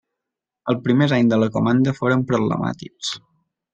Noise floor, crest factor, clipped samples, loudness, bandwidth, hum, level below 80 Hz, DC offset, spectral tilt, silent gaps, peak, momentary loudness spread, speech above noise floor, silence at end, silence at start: -85 dBFS; 16 dB; under 0.1%; -20 LUFS; 8.8 kHz; none; -58 dBFS; under 0.1%; -6.5 dB/octave; none; -4 dBFS; 11 LU; 66 dB; 0.55 s; 0.65 s